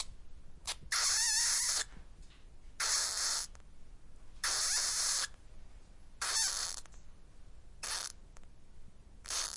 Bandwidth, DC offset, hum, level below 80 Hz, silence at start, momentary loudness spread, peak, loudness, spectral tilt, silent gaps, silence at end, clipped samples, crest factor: 12 kHz; under 0.1%; none; -54 dBFS; 0 s; 16 LU; -18 dBFS; -32 LUFS; 2 dB/octave; none; 0 s; under 0.1%; 20 dB